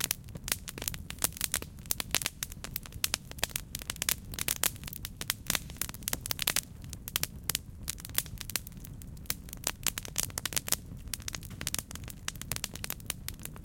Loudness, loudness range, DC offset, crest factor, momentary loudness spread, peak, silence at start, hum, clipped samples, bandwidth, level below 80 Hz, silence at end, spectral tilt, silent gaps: -34 LUFS; 3 LU; under 0.1%; 34 dB; 9 LU; -2 dBFS; 0 s; none; under 0.1%; 17 kHz; -50 dBFS; 0 s; -1.5 dB/octave; none